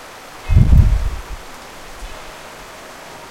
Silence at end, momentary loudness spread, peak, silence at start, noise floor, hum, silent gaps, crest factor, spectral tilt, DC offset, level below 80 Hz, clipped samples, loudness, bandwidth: 0 s; 22 LU; 0 dBFS; 0 s; -36 dBFS; none; none; 18 dB; -6.5 dB/octave; under 0.1%; -20 dBFS; under 0.1%; -15 LUFS; 15.5 kHz